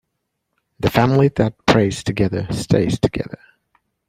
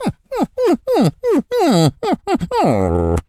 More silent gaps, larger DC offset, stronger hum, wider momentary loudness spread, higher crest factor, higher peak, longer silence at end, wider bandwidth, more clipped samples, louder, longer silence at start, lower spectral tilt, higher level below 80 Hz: neither; neither; neither; about the same, 9 LU vs 7 LU; about the same, 18 dB vs 16 dB; about the same, 0 dBFS vs 0 dBFS; first, 0.75 s vs 0.05 s; about the same, 16 kHz vs 15 kHz; neither; about the same, -18 LUFS vs -17 LUFS; first, 0.8 s vs 0 s; about the same, -6.5 dB/octave vs -6.5 dB/octave; about the same, -42 dBFS vs -38 dBFS